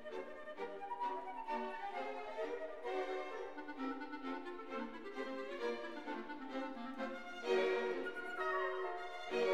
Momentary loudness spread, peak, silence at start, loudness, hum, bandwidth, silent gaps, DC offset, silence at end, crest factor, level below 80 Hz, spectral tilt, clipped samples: 8 LU; -24 dBFS; 0 s; -43 LUFS; none; 12 kHz; none; 0.2%; 0 s; 20 dB; -74 dBFS; -4 dB/octave; under 0.1%